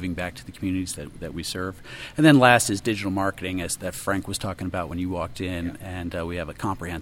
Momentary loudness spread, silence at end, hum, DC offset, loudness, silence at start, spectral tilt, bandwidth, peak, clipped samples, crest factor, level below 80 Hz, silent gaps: 16 LU; 0 s; none; under 0.1%; -25 LUFS; 0 s; -4.5 dB/octave; 17 kHz; 0 dBFS; under 0.1%; 24 dB; -46 dBFS; none